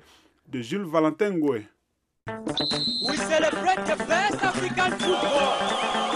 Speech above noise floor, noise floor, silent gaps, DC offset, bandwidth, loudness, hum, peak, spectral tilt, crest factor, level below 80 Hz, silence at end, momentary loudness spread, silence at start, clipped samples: 51 dB; -76 dBFS; none; under 0.1%; 13 kHz; -24 LUFS; none; -8 dBFS; -3.5 dB/octave; 18 dB; -58 dBFS; 0 s; 10 LU; 0.5 s; under 0.1%